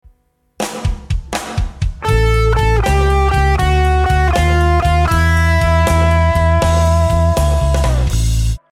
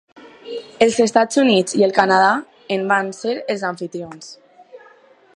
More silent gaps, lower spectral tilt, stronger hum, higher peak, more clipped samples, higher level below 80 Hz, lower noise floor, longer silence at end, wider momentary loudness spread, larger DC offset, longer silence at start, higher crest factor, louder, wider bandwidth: neither; first, -6 dB/octave vs -4 dB/octave; neither; about the same, -2 dBFS vs 0 dBFS; neither; first, -16 dBFS vs -64 dBFS; first, -56 dBFS vs -50 dBFS; second, 0.15 s vs 0.6 s; second, 8 LU vs 18 LU; neither; first, 0.6 s vs 0.15 s; second, 12 dB vs 18 dB; first, -14 LUFS vs -17 LUFS; first, 15 kHz vs 11.5 kHz